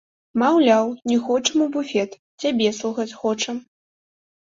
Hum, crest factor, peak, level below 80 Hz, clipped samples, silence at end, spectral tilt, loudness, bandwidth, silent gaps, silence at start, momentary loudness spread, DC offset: none; 18 dB; -4 dBFS; -66 dBFS; under 0.1%; 0.95 s; -3.5 dB/octave; -21 LUFS; 7.8 kHz; 2.19-2.38 s; 0.35 s; 10 LU; under 0.1%